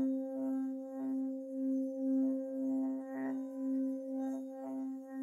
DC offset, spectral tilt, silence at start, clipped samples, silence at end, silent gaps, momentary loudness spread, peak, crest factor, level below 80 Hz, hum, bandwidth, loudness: under 0.1%; -7.5 dB/octave; 0 s; under 0.1%; 0 s; none; 7 LU; -26 dBFS; 10 dB; under -90 dBFS; none; 6.8 kHz; -38 LUFS